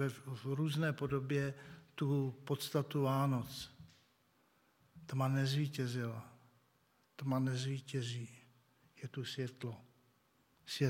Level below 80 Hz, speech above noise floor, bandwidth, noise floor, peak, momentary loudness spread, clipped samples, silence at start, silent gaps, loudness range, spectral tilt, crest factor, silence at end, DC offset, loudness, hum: -74 dBFS; 37 dB; 16.5 kHz; -74 dBFS; -20 dBFS; 17 LU; under 0.1%; 0 s; none; 5 LU; -6 dB/octave; 18 dB; 0 s; under 0.1%; -39 LUFS; none